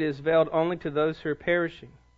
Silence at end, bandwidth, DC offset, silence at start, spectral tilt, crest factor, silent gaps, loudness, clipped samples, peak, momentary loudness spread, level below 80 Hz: 0.3 s; 7.2 kHz; under 0.1%; 0 s; -8 dB/octave; 16 dB; none; -26 LUFS; under 0.1%; -10 dBFS; 6 LU; -58 dBFS